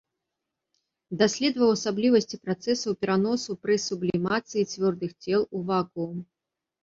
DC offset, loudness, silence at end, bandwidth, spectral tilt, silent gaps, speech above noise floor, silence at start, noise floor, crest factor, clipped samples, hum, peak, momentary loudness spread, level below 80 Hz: under 0.1%; -26 LUFS; 0.6 s; 7.8 kHz; -5 dB/octave; none; 59 dB; 1.1 s; -85 dBFS; 18 dB; under 0.1%; none; -8 dBFS; 9 LU; -66 dBFS